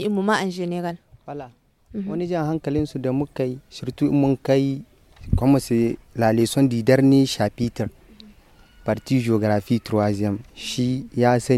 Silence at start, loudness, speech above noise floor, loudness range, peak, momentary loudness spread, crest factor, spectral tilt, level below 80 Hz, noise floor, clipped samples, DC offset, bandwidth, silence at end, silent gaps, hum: 0 s; -22 LUFS; 30 dB; 6 LU; -2 dBFS; 14 LU; 20 dB; -6.5 dB/octave; -42 dBFS; -51 dBFS; under 0.1%; under 0.1%; 14.5 kHz; 0 s; none; none